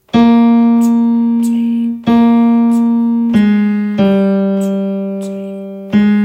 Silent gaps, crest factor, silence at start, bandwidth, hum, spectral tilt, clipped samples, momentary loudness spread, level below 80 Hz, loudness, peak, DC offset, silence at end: none; 10 dB; 0.15 s; 9.8 kHz; none; -8 dB/octave; under 0.1%; 11 LU; -50 dBFS; -12 LUFS; 0 dBFS; under 0.1%; 0 s